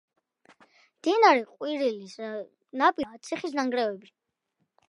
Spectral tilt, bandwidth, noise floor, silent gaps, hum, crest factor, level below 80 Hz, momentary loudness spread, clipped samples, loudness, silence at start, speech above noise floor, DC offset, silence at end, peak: -3.5 dB/octave; 11.5 kHz; -78 dBFS; none; none; 22 dB; -74 dBFS; 17 LU; under 0.1%; -26 LUFS; 1.05 s; 52 dB; under 0.1%; 0.9 s; -6 dBFS